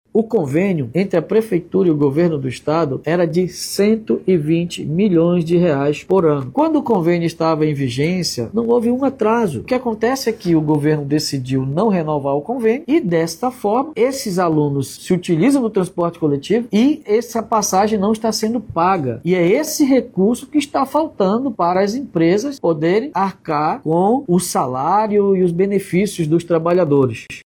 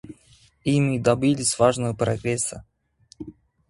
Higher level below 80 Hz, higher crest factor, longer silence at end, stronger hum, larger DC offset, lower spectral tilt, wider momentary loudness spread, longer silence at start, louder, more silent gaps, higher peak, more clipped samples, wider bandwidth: about the same, -52 dBFS vs -52 dBFS; second, 12 dB vs 20 dB; second, 0.05 s vs 0.4 s; neither; neither; about the same, -6 dB/octave vs -5 dB/octave; second, 5 LU vs 21 LU; about the same, 0.15 s vs 0.05 s; first, -17 LUFS vs -22 LUFS; neither; about the same, -4 dBFS vs -4 dBFS; neither; first, 18.5 kHz vs 11.5 kHz